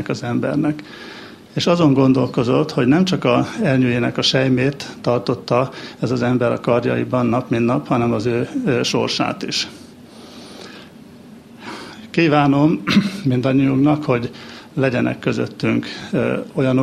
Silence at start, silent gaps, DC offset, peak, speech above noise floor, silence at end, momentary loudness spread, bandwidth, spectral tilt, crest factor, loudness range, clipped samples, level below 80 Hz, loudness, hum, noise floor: 0 s; none; under 0.1%; -2 dBFS; 23 dB; 0 s; 18 LU; 13 kHz; -6 dB/octave; 16 dB; 5 LU; under 0.1%; -52 dBFS; -18 LUFS; none; -41 dBFS